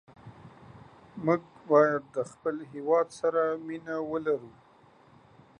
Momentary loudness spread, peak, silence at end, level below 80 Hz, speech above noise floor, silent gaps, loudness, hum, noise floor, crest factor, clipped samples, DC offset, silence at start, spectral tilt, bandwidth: 13 LU; -8 dBFS; 1.1 s; -70 dBFS; 30 dB; none; -29 LUFS; none; -58 dBFS; 22 dB; under 0.1%; under 0.1%; 0.25 s; -7 dB/octave; 10.5 kHz